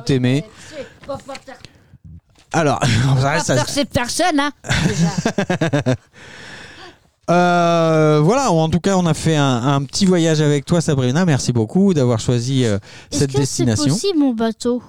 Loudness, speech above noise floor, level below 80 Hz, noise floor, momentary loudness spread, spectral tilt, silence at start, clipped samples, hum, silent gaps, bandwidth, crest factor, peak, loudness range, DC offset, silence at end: -17 LUFS; 26 dB; -44 dBFS; -43 dBFS; 16 LU; -5.5 dB/octave; 0 s; under 0.1%; none; none; 16 kHz; 12 dB; -4 dBFS; 4 LU; 1%; 0 s